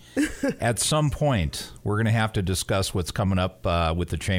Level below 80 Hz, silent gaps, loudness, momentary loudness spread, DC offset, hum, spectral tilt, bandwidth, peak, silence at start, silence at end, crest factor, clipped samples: -40 dBFS; none; -25 LUFS; 5 LU; under 0.1%; none; -5 dB/octave; 16.5 kHz; -10 dBFS; 0 s; 0 s; 14 dB; under 0.1%